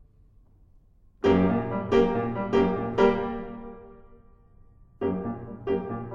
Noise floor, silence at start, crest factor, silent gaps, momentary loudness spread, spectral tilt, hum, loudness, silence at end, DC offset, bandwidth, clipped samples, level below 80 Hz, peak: -57 dBFS; 1.25 s; 20 dB; none; 14 LU; -8 dB/octave; none; -26 LUFS; 0 s; under 0.1%; 7.2 kHz; under 0.1%; -46 dBFS; -8 dBFS